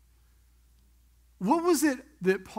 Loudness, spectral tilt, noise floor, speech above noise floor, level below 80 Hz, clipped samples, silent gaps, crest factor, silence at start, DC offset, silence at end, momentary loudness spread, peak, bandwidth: -27 LUFS; -5 dB/octave; -61 dBFS; 35 dB; -62 dBFS; under 0.1%; none; 18 dB; 1.4 s; under 0.1%; 0.05 s; 6 LU; -12 dBFS; 16 kHz